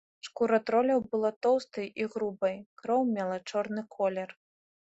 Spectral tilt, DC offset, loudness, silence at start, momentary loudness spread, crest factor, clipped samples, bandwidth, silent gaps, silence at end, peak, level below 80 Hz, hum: -6 dB/octave; under 0.1%; -30 LUFS; 0.25 s; 11 LU; 16 dB; under 0.1%; 8.2 kHz; 1.36-1.41 s, 2.66-2.77 s; 0.55 s; -14 dBFS; -74 dBFS; none